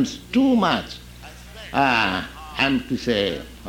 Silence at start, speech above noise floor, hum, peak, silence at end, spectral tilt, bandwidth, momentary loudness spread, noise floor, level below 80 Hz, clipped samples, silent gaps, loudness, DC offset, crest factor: 0 s; 19 dB; 60 Hz at -45 dBFS; -4 dBFS; 0 s; -5 dB/octave; 16.5 kHz; 20 LU; -41 dBFS; -44 dBFS; under 0.1%; none; -21 LUFS; under 0.1%; 18 dB